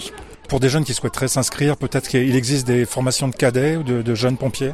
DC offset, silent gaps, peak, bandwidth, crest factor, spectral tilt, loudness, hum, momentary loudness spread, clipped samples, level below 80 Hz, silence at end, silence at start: under 0.1%; none; -4 dBFS; 15 kHz; 14 dB; -5 dB/octave; -19 LUFS; none; 5 LU; under 0.1%; -44 dBFS; 0 s; 0 s